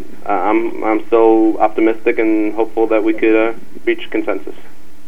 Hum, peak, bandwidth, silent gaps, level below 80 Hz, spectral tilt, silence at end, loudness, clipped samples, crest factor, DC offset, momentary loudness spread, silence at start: none; 0 dBFS; 3.9 kHz; none; -54 dBFS; -6.5 dB/octave; 0.05 s; -15 LUFS; under 0.1%; 16 dB; 10%; 9 LU; 0 s